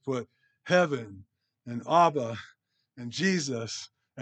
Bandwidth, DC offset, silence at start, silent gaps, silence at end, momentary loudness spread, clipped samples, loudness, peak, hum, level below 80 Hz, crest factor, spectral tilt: 9 kHz; under 0.1%; 0.05 s; none; 0 s; 22 LU; under 0.1%; -28 LUFS; -10 dBFS; none; -78 dBFS; 20 dB; -5 dB/octave